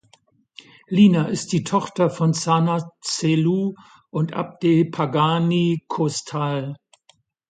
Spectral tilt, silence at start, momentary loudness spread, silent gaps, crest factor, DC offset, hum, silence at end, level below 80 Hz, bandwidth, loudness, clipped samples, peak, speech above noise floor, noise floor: -6 dB/octave; 0.9 s; 10 LU; none; 16 dB; under 0.1%; none; 0.75 s; -64 dBFS; 9.4 kHz; -21 LUFS; under 0.1%; -4 dBFS; 40 dB; -60 dBFS